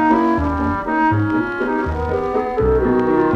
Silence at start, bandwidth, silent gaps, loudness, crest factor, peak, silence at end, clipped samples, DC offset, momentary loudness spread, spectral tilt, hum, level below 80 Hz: 0 s; 7.2 kHz; none; -18 LUFS; 14 dB; -4 dBFS; 0 s; under 0.1%; under 0.1%; 5 LU; -9 dB/octave; none; -30 dBFS